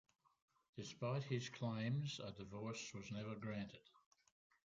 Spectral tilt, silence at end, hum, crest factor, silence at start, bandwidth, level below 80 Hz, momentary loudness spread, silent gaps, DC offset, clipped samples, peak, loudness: -5.5 dB/octave; 0.95 s; none; 20 dB; 0.75 s; 7.8 kHz; -78 dBFS; 11 LU; none; under 0.1%; under 0.1%; -30 dBFS; -47 LUFS